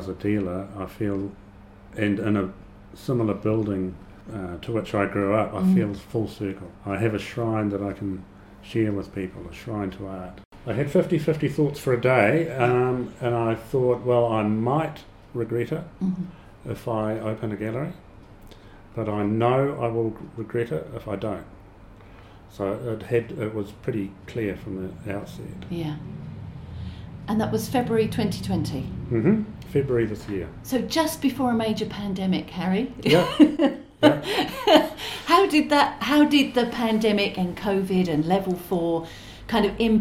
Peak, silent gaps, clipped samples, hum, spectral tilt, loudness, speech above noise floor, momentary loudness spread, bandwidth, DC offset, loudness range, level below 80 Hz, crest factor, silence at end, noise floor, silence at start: -2 dBFS; 10.45-10.51 s; under 0.1%; none; -6.5 dB/octave; -24 LUFS; 23 dB; 16 LU; 16 kHz; under 0.1%; 10 LU; -48 dBFS; 22 dB; 0 s; -46 dBFS; 0 s